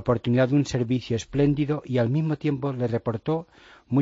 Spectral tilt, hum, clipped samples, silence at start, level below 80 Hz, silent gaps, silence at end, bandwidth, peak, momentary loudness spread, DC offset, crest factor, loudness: -7.5 dB/octave; none; under 0.1%; 0 s; -50 dBFS; none; 0 s; 7.8 kHz; -8 dBFS; 6 LU; under 0.1%; 16 dB; -25 LUFS